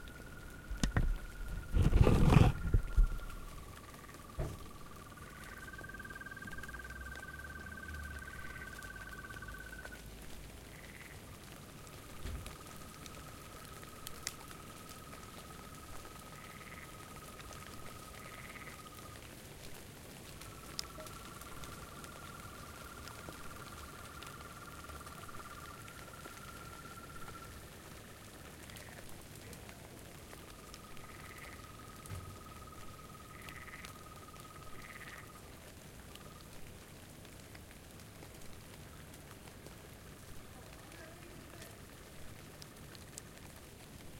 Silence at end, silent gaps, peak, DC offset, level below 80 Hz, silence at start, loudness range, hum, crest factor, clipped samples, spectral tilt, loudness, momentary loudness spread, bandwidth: 0 s; none; -10 dBFS; under 0.1%; -44 dBFS; 0 s; 18 LU; none; 30 dB; under 0.1%; -5.5 dB/octave; -44 LUFS; 11 LU; 17 kHz